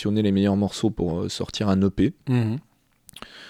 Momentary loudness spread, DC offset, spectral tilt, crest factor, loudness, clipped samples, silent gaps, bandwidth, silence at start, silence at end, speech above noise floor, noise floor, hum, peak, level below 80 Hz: 9 LU; under 0.1%; -7 dB/octave; 14 dB; -24 LUFS; under 0.1%; none; 12.5 kHz; 0 s; 0 s; 32 dB; -55 dBFS; none; -10 dBFS; -46 dBFS